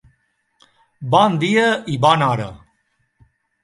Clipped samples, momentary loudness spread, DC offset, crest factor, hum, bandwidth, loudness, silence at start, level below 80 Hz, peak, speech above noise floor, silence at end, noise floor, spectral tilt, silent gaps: under 0.1%; 12 LU; under 0.1%; 20 dB; none; 11.5 kHz; -16 LUFS; 1 s; -54 dBFS; 0 dBFS; 50 dB; 1.05 s; -67 dBFS; -5.5 dB/octave; none